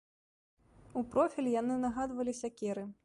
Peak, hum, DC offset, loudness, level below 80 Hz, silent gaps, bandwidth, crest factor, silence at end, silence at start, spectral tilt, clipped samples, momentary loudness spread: -16 dBFS; none; under 0.1%; -35 LUFS; -64 dBFS; none; 11.5 kHz; 20 dB; 0.1 s; 0.95 s; -6 dB/octave; under 0.1%; 7 LU